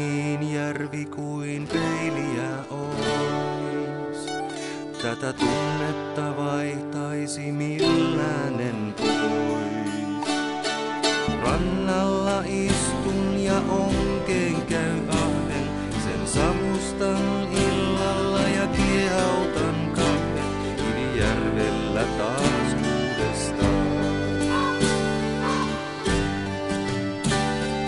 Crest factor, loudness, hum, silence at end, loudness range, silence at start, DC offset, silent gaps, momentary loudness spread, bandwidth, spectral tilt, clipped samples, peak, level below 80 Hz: 18 dB; -25 LUFS; none; 0 s; 4 LU; 0 s; under 0.1%; none; 6 LU; 11.5 kHz; -5 dB/octave; under 0.1%; -6 dBFS; -40 dBFS